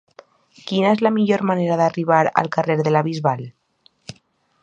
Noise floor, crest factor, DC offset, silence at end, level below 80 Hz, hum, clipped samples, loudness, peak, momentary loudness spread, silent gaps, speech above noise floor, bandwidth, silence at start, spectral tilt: -59 dBFS; 20 dB; under 0.1%; 0.5 s; -66 dBFS; none; under 0.1%; -19 LUFS; 0 dBFS; 21 LU; none; 41 dB; 9 kHz; 0.65 s; -7 dB/octave